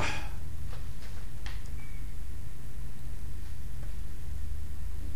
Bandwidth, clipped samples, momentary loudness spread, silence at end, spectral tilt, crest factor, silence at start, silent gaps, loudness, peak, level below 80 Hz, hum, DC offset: 15.5 kHz; under 0.1%; 4 LU; 0 s; -4.5 dB/octave; 16 dB; 0 s; none; -42 LUFS; -16 dBFS; -40 dBFS; none; 5%